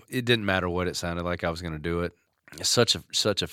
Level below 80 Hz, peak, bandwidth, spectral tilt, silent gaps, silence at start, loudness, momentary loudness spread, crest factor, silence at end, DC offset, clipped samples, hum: -50 dBFS; -6 dBFS; 17 kHz; -3.5 dB/octave; none; 0.1 s; -26 LUFS; 9 LU; 22 dB; 0 s; under 0.1%; under 0.1%; none